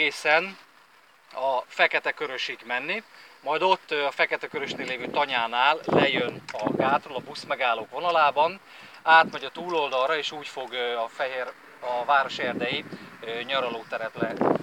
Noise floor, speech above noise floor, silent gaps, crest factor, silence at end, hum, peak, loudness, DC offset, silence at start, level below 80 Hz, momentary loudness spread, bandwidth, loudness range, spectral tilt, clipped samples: -57 dBFS; 31 dB; none; 20 dB; 0 s; none; -6 dBFS; -25 LUFS; under 0.1%; 0 s; -76 dBFS; 12 LU; 16.5 kHz; 4 LU; -4 dB/octave; under 0.1%